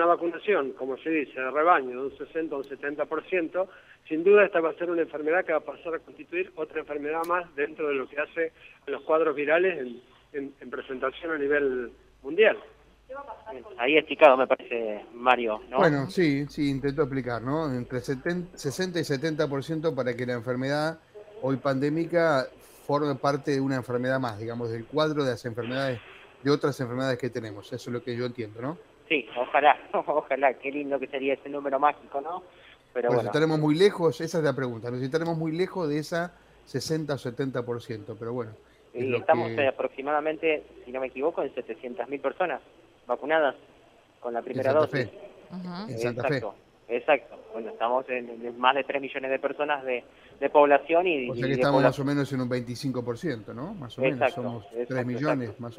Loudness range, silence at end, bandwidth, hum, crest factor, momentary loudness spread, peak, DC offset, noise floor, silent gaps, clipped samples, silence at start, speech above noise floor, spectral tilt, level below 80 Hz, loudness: 6 LU; 0.05 s; 15.5 kHz; none; 24 dB; 14 LU; -4 dBFS; under 0.1%; -58 dBFS; none; under 0.1%; 0 s; 31 dB; -6 dB/octave; -62 dBFS; -27 LUFS